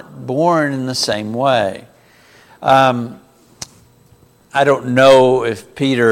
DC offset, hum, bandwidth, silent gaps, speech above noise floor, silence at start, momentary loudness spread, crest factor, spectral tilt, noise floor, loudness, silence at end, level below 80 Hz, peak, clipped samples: under 0.1%; none; 16 kHz; none; 36 dB; 0.1 s; 22 LU; 16 dB; -5 dB/octave; -49 dBFS; -14 LUFS; 0 s; -56 dBFS; 0 dBFS; under 0.1%